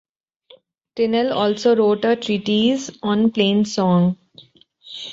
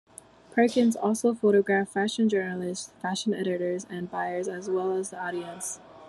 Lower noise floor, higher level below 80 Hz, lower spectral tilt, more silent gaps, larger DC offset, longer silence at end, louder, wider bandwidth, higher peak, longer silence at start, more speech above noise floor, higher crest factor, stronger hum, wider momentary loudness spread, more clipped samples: about the same, -52 dBFS vs -51 dBFS; first, -60 dBFS vs -72 dBFS; about the same, -6 dB/octave vs -5 dB/octave; neither; neither; about the same, 0 s vs 0 s; first, -18 LUFS vs -27 LUFS; second, 7.8 kHz vs 13 kHz; first, -4 dBFS vs -10 dBFS; first, 0.95 s vs 0.5 s; first, 34 dB vs 24 dB; about the same, 16 dB vs 18 dB; neither; about the same, 10 LU vs 11 LU; neither